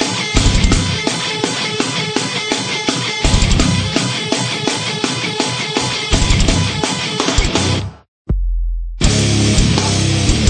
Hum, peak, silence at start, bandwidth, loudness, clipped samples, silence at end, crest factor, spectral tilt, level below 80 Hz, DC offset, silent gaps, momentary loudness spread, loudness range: none; 0 dBFS; 0 s; 9.8 kHz; -16 LUFS; under 0.1%; 0 s; 16 dB; -4 dB/octave; -20 dBFS; under 0.1%; 8.08-8.25 s; 5 LU; 1 LU